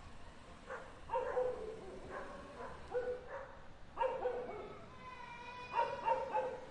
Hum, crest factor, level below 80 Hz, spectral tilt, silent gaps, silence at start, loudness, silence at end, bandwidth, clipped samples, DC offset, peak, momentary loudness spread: none; 20 dB; -60 dBFS; -5 dB/octave; none; 0 s; -42 LUFS; 0 s; 10.5 kHz; under 0.1%; under 0.1%; -22 dBFS; 16 LU